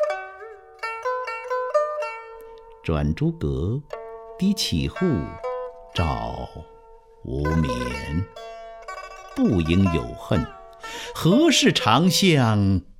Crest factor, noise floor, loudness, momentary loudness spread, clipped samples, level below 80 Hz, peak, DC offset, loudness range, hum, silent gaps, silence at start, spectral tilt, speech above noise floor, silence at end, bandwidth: 20 dB; -48 dBFS; -23 LUFS; 21 LU; under 0.1%; -38 dBFS; -4 dBFS; under 0.1%; 8 LU; none; none; 0 s; -5 dB/octave; 27 dB; 0.1 s; 16.5 kHz